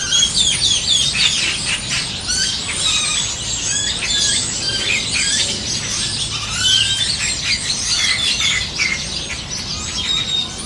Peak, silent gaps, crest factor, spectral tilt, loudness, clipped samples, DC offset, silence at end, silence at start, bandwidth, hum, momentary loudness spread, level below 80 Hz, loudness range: -2 dBFS; none; 16 dB; 0 dB/octave; -16 LUFS; under 0.1%; under 0.1%; 0 s; 0 s; 12 kHz; none; 7 LU; -38 dBFS; 2 LU